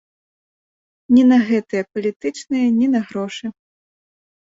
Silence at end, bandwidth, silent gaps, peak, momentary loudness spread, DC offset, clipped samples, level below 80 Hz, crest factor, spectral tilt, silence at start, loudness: 1.1 s; 7.8 kHz; 2.16-2.20 s; -4 dBFS; 14 LU; under 0.1%; under 0.1%; -62 dBFS; 16 dB; -6 dB/octave; 1.1 s; -18 LUFS